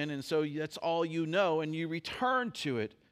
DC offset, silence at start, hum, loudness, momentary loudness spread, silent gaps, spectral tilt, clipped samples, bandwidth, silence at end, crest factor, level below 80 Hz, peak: under 0.1%; 0 s; none; -33 LUFS; 6 LU; none; -5.5 dB/octave; under 0.1%; 15.5 kHz; 0.25 s; 16 dB; -72 dBFS; -18 dBFS